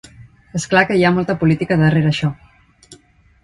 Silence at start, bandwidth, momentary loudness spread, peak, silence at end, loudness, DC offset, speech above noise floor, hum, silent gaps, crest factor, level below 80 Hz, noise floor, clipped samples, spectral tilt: 0.2 s; 11 kHz; 10 LU; 0 dBFS; 0.5 s; -16 LUFS; under 0.1%; 34 dB; none; none; 18 dB; -46 dBFS; -49 dBFS; under 0.1%; -6.5 dB/octave